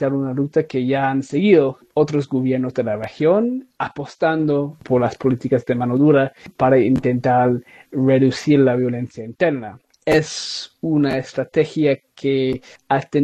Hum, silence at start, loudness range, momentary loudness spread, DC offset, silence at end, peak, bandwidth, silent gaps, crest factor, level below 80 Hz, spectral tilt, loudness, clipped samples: none; 0 s; 3 LU; 11 LU; under 0.1%; 0 s; -2 dBFS; 9.8 kHz; none; 16 dB; -54 dBFS; -7 dB/octave; -19 LUFS; under 0.1%